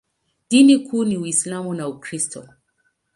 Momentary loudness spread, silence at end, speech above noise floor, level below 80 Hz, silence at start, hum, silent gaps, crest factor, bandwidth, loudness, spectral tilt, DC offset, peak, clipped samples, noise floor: 15 LU; 0.75 s; 50 dB; -66 dBFS; 0.5 s; none; none; 18 dB; 11.5 kHz; -19 LUFS; -4 dB/octave; under 0.1%; -2 dBFS; under 0.1%; -68 dBFS